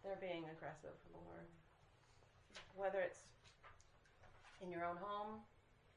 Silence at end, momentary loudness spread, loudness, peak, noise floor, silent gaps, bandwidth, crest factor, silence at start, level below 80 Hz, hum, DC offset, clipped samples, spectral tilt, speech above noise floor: 0.05 s; 21 LU; -49 LUFS; -32 dBFS; -71 dBFS; none; 10.5 kHz; 20 dB; 0 s; -76 dBFS; none; under 0.1%; under 0.1%; -5.5 dB/octave; 22 dB